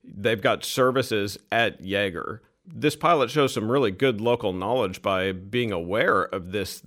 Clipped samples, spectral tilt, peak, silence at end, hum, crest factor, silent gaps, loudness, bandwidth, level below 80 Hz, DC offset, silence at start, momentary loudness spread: under 0.1%; -5 dB/octave; -8 dBFS; 0.05 s; none; 18 dB; none; -24 LUFS; 16.5 kHz; -58 dBFS; under 0.1%; 0.05 s; 7 LU